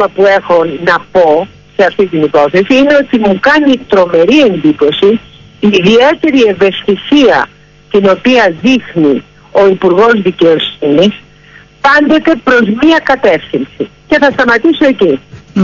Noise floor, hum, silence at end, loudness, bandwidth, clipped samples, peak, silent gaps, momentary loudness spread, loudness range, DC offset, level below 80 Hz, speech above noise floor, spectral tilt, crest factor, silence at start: -38 dBFS; none; 0 s; -8 LUFS; 7.2 kHz; 0.1%; 0 dBFS; none; 7 LU; 1 LU; under 0.1%; -42 dBFS; 30 dB; -6 dB/octave; 8 dB; 0 s